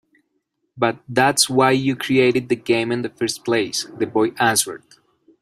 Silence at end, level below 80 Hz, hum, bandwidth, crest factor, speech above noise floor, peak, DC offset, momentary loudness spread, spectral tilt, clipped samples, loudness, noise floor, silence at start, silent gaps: 0.65 s; -60 dBFS; none; 16 kHz; 18 dB; 53 dB; -2 dBFS; under 0.1%; 9 LU; -3.5 dB/octave; under 0.1%; -19 LUFS; -72 dBFS; 0.75 s; none